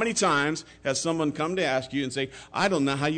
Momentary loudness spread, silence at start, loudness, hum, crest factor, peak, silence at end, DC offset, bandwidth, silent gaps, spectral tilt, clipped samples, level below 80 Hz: 8 LU; 0 s; -26 LUFS; none; 14 dB; -12 dBFS; 0 s; under 0.1%; 9.6 kHz; none; -4 dB/octave; under 0.1%; -60 dBFS